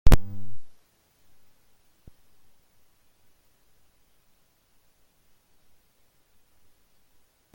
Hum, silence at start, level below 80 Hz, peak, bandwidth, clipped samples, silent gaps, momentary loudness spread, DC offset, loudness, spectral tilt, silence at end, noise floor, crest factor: none; 0.05 s; -32 dBFS; -2 dBFS; 17 kHz; under 0.1%; none; 34 LU; under 0.1%; -28 LUFS; -6 dB/octave; 6.85 s; -65 dBFS; 22 dB